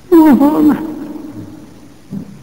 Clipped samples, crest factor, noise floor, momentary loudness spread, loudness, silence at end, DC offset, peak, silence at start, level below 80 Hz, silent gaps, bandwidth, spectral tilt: under 0.1%; 12 dB; -38 dBFS; 23 LU; -10 LUFS; 0.2 s; under 0.1%; 0 dBFS; 0.1 s; -46 dBFS; none; 16.5 kHz; -7.5 dB/octave